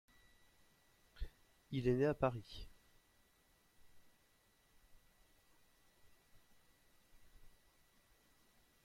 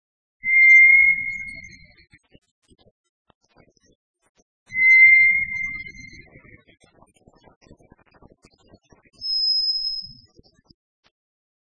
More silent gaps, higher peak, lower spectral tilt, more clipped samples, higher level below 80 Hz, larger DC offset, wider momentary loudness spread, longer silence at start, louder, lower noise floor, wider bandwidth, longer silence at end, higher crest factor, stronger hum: second, none vs 2.38-2.42 s, 2.51-2.62 s, 2.91-3.25 s, 3.35-3.41 s, 3.95-4.14 s, 4.29-4.35 s, 4.42-4.66 s, 7.56-7.61 s; second, -22 dBFS vs -4 dBFS; first, -7.5 dB/octave vs -0.5 dB/octave; neither; about the same, -60 dBFS vs -58 dBFS; neither; about the same, 20 LU vs 22 LU; first, 1.15 s vs 0.45 s; second, -38 LUFS vs -14 LUFS; first, -74 dBFS vs -58 dBFS; first, 16.5 kHz vs 6.8 kHz; second, 1.35 s vs 1.6 s; first, 26 dB vs 18 dB; neither